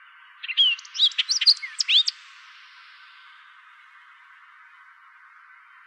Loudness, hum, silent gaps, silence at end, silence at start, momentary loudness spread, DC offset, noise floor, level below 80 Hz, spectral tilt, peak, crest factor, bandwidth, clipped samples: -19 LUFS; none; none; 3.75 s; 0.45 s; 9 LU; under 0.1%; -51 dBFS; under -90 dBFS; 13.5 dB/octave; -6 dBFS; 22 dB; 12.5 kHz; under 0.1%